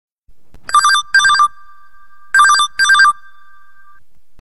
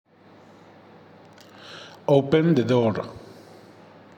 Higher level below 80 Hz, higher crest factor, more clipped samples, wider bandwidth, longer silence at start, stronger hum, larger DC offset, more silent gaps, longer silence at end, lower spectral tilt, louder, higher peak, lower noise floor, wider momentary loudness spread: first, -52 dBFS vs -64 dBFS; about the same, 16 dB vs 20 dB; neither; first, 12 kHz vs 9.6 kHz; second, 0.05 s vs 1.65 s; neither; first, 2% vs under 0.1%; first, 0.12-0.22 s vs none; first, 1.3 s vs 1 s; second, 3 dB/octave vs -8 dB/octave; first, -11 LUFS vs -21 LUFS; first, 0 dBFS vs -6 dBFS; about the same, -51 dBFS vs -51 dBFS; second, 6 LU vs 25 LU